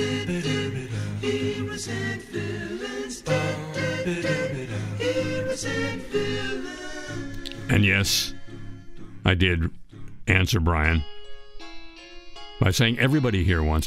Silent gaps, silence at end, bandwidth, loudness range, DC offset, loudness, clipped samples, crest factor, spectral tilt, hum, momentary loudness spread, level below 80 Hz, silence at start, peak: none; 0 s; 16 kHz; 4 LU; under 0.1%; -25 LUFS; under 0.1%; 22 dB; -5 dB/octave; none; 21 LU; -38 dBFS; 0 s; -4 dBFS